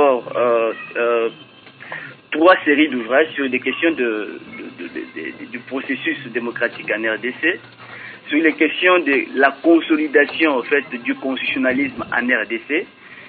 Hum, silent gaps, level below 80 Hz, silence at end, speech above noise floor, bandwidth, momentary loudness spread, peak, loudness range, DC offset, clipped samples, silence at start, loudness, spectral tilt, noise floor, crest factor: none; none; -64 dBFS; 0 s; 24 dB; 4.7 kHz; 17 LU; 0 dBFS; 7 LU; under 0.1%; under 0.1%; 0 s; -18 LUFS; -9 dB/octave; -42 dBFS; 18 dB